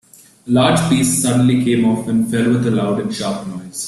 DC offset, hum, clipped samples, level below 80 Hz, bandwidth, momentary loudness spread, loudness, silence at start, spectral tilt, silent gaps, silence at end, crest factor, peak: under 0.1%; none; under 0.1%; -50 dBFS; 13.5 kHz; 9 LU; -16 LUFS; 0.45 s; -5 dB/octave; none; 0 s; 14 dB; -2 dBFS